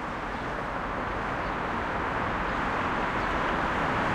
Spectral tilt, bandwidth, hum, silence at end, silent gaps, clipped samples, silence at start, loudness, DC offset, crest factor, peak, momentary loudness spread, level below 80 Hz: -6 dB/octave; 15.5 kHz; none; 0 s; none; under 0.1%; 0 s; -29 LUFS; under 0.1%; 14 dB; -16 dBFS; 5 LU; -42 dBFS